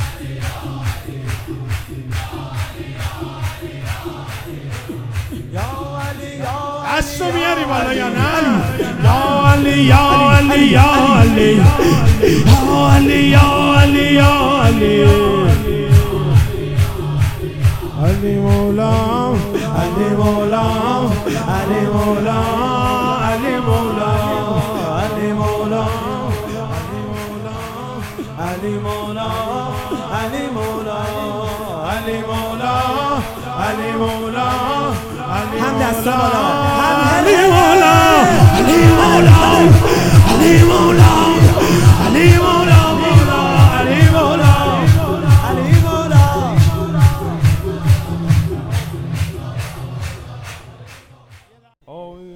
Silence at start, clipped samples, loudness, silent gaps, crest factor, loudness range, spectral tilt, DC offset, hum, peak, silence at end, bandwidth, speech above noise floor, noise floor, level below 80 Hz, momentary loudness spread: 0 s; 0.5%; -13 LUFS; none; 12 dB; 15 LU; -6 dB/octave; under 0.1%; none; 0 dBFS; 0 s; 17 kHz; 39 dB; -51 dBFS; -28 dBFS; 16 LU